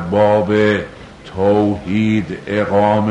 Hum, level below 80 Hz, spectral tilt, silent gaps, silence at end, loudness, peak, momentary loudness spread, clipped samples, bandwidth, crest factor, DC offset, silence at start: none; -44 dBFS; -7.5 dB/octave; none; 0 s; -15 LUFS; -2 dBFS; 11 LU; under 0.1%; 9.8 kHz; 12 dB; under 0.1%; 0 s